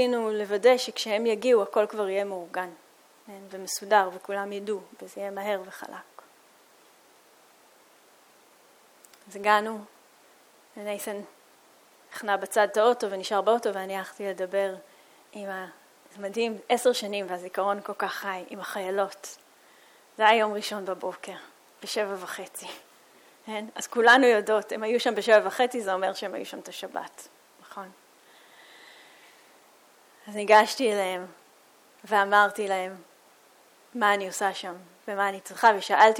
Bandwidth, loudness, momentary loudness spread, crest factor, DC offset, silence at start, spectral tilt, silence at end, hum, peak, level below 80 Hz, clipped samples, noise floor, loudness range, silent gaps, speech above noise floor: 18 kHz; -26 LUFS; 21 LU; 22 dB; under 0.1%; 0 s; -2.5 dB/octave; 0 s; none; -6 dBFS; -82 dBFS; under 0.1%; -58 dBFS; 12 LU; none; 32 dB